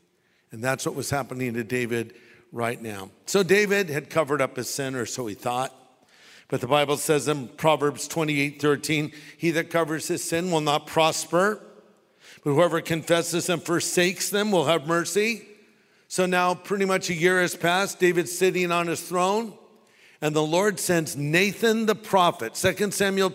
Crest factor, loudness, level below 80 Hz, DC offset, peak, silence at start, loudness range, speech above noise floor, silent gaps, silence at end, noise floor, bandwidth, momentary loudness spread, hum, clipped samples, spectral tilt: 20 dB; -24 LUFS; -64 dBFS; under 0.1%; -6 dBFS; 0.5 s; 3 LU; 42 dB; none; 0 s; -66 dBFS; 16 kHz; 8 LU; none; under 0.1%; -4 dB/octave